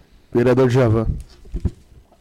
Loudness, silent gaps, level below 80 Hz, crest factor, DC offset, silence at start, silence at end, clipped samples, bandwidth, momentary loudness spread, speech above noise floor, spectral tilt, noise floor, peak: -19 LUFS; none; -32 dBFS; 10 dB; under 0.1%; 0.35 s; 0.5 s; under 0.1%; 12 kHz; 15 LU; 29 dB; -8.5 dB/octave; -45 dBFS; -10 dBFS